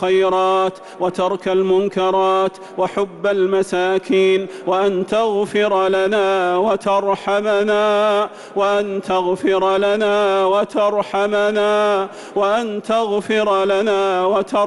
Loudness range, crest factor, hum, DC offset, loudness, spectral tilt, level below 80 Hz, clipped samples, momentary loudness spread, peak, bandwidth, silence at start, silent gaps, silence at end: 1 LU; 10 dB; none; under 0.1%; -17 LUFS; -5 dB/octave; -58 dBFS; under 0.1%; 5 LU; -8 dBFS; 11.5 kHz; 0 s; none; 0 s